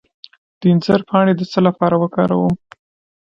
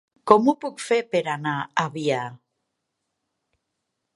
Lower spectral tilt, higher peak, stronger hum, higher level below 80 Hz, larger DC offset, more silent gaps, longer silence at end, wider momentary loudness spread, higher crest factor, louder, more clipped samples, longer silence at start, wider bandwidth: first, -8.5 dB/octave vs -5.5 dB/octave; about the same, 0 dBFS vs 0 dBFS; neither; first, -50 dBFS vs -70 dBFS; neither; neither; second, 0.7 s vs 1.8 s; second, 5 LU vs 10 LU; second, 16 dB vs 24 dB; first, -16 LUFS vs -23 LUFS; neither; first, 0.6 s vs 0.25 s; second, 7 kHz vs 11.5 kHz